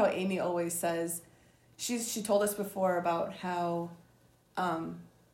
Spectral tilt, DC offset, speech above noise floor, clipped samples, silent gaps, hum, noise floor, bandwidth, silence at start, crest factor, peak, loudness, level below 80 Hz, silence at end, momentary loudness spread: -4.5 dB/octave; under 0.1%; 32 dB; under 0.1%; none; none; -65 dBFS; 16 kHz; 0 s; 18 dB; -16 dBFS; -33 LUFS; -72 dBFS; 0.25 s; 10 LU